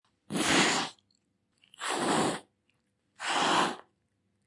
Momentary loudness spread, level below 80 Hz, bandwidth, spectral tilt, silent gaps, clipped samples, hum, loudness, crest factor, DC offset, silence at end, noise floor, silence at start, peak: 14 LU; -68 dBFS; 11.5 kHz; -2.5 dB/octave; none; under 0.1%; none; -29 LUFS; 22 dB; under 0.1%; 0.65 s; -76 dBFS; 0.3 s; -10 dBFS